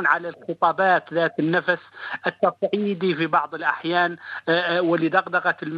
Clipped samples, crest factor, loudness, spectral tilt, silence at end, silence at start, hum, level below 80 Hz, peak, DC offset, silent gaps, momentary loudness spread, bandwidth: under 0.1%; 18 dB; -22 LUFS; -7.5 dB/octave; 0 s; 0 s; none; -74 dBFS; -4 dBFS; under 0.1%; none; 6 LU; 6.8 kHz